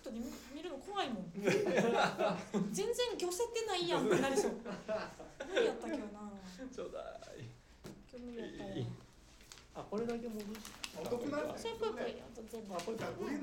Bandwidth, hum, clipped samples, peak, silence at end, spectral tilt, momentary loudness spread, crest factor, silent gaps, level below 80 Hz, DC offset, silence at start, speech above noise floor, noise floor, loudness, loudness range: 17 kHz; none; under 0.1%; -18 dBFS; 0 s; -4.5 dB/octave; 18 LU; 20 dB; none; -64 dBFS; under 0.1%; 0 s; 21 dB; -59 dBFS; -38 LUFS; 12 LU